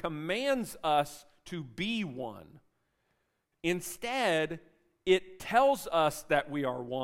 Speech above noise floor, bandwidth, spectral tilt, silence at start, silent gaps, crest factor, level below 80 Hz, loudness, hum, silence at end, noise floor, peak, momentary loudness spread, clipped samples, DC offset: 48 dB; 16 kHz; -4.5 dB/octave; 0.05 s; none; 20 dB; -62 dBFS; -31 LUFS; none; 0 s; -79 dBFS; -12 dBFS; 15 LU; under 0.1%; under 0.1%